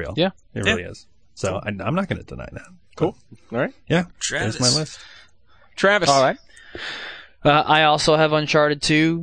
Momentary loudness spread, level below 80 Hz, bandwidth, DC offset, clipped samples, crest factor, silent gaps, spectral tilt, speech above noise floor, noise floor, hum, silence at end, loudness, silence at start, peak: 20 LU; -48 dBFS; 9.8 kHz; 0.3%; under 0.1%; 20 dB; none; -4 dB/octave; 36 dB; -56 dBFS; none; 0 s; -20 LUFS; 0 s; -2 dBFS